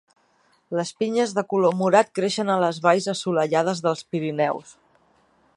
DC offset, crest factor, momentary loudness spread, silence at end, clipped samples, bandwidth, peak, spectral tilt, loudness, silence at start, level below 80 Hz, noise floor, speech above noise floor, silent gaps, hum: under 0.1%; 20 dB; 8 LU; 0.85 s; under 0.1%; 11.5 kHz; -2 dBFS; -5 dB/octave; -22 LUFS; 0.7 s; -72 dBFS; -63 dBFS; 41 dB; none; none